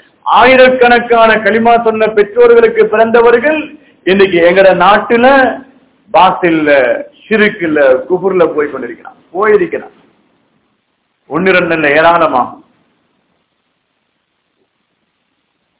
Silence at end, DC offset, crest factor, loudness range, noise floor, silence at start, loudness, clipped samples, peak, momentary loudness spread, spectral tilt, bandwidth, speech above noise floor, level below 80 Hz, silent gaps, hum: 3.25 s; under 0.1%; 10 dB; 8 LU; -63 dBFS; 0.25 s; -8 LUFS; 4%; 0 dBFS; 12 LU; -9 dB/octave; 4 kHz; 55 dB; -46 dBFS; none; none